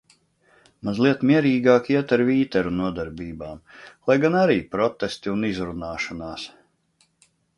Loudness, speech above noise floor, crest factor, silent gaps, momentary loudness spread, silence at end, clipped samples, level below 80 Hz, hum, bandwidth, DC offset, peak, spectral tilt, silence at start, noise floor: -22 LUFS; 43 dB; 18 dB; none; 16 LU; 1.1 s; under 0.1%; -52 dBFS; none; 11.5 kHz; under 0.1%; -4 dBFS; -7 dB/octave; 0.85 s; -65 dBFS